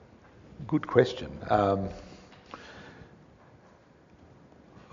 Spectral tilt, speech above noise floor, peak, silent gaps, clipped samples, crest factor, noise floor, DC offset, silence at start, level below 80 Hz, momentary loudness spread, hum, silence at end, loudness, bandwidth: -5.5 dB/octave; 31 dB; -6 dBFS; none; under 0.1%; 26 dB; -57 dBFS; under 0.1%; 0.6 s; -56 dBFS; 25 LU; none; 1.85 s; -28 LUFS; 7.2 kHz